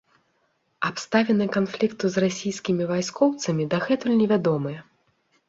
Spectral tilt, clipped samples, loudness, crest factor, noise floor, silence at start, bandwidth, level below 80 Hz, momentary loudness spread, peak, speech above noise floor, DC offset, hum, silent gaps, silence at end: -5.5 dB/octave; under 0.1%; -24 LUFS; 18 dB; -70 dBFS; 0.8 s; 8 kHz; -64 dBFS; 8 LU; -6 dBFS; 47 dB; under 0.1%; none; none; 0.65 s